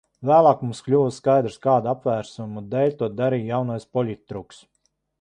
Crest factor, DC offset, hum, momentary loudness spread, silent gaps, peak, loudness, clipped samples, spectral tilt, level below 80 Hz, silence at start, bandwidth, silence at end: 18 dB; under 0.1%; none; 15 LU; none; -4 dBFS; -22 LUFS; under 0.1%; -7.5 dB/octave; -60 dBFS; 0.2 s; 10 kHz; 0.8 s